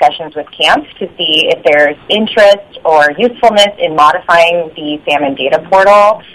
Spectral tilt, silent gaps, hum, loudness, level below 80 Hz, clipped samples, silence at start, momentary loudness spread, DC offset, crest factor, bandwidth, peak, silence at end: -3 dB/octave; none; none; -9 LUFS; -48 dBFS; 2%; 0 s; 8 LU; under 0.1%; 10 dB; 12.5 kHz; 0 dBFS; 0.15 s